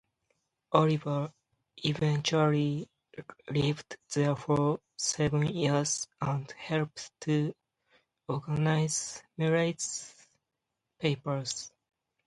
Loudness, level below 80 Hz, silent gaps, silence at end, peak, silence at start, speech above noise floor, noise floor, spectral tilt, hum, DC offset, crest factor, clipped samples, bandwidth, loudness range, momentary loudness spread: -31 LUFS; -62 dBFS; none; 0.6 s; -8 dBFS; 0.7 s; 56 dB; -86 dBFS; -5 dB/octave; none; under 0.1%; 22 dB; under 0.1%; 11.5 kHz; 3 LU; 12 LU